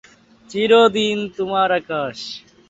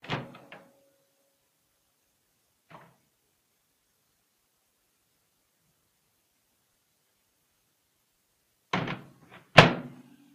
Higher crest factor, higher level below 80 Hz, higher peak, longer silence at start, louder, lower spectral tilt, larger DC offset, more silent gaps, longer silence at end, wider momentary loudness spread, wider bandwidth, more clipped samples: second, 16 dB vs 34 dB; about the same, -60 dBFS vs -60 dBFS; about the same, -2 dBFS vs 0 dBFS; first, 0.5 s vs 0.1 s; first, -18 LUFS vs -23 LUFS; about the same, -4.5 dB/octave vs -5 dB/octave; neither; neither; second, 0.3 s vs 0.45 s; second, 16 LU vs 26 LU; second, 8 kHz vs 15.5 kHz; neither